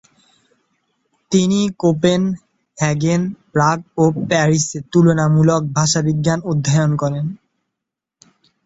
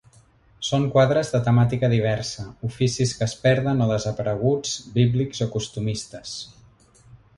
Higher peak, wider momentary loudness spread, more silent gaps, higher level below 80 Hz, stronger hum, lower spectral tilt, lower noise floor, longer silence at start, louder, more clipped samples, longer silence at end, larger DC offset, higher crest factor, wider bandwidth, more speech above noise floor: first, -2 dBFS vs -6 dBFS; second, 7 LU vs 12 LU; neither; about the same, -52 dBFS vs -50 dBFS; neither; about the same, -5.5 dB/octave vs -6 dB/octave; first, -82 dBFS vs -55 dBFS; first, 1.3 s vs 0.6 s; first, -17 LUFS vs -23 LUFS; neither; first, 1.3 s vs 0.2 s; neither; about the same, 16 dB vs 18 dB; second, 8 kHz vs 11.5 kHz; first, 66 dB vs 33 dB